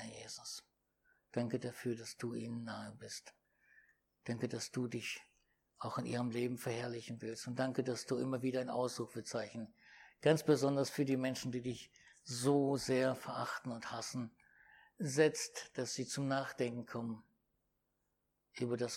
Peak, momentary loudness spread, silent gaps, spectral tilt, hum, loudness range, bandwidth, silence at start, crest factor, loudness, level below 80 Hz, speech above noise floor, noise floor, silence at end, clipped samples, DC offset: -18 dBFS; 15 LU; none; -5 dB/octave; none; 8 LU; 16.5 kHz; 0 s; 22 dB; -39 LUFS; -78 dBFS; 46 dB; -84 dBFS; 0 s; under 0.1%; under 0.1%